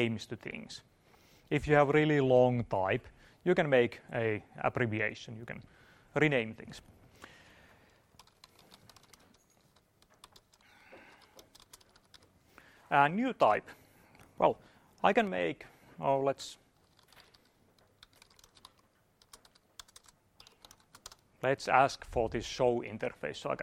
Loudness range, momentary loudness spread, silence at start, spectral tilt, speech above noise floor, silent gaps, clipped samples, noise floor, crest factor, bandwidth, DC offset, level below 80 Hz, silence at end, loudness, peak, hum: 10 LU; 22 LU; 0 s; -6 dB/octave; 39 dB; none; under 0.1%; -70 dBFS; 24 dB; 15.5 kHz; under 0.1%; -62 dBFS; 0 s; -31 LUFS; -10 dBFS; none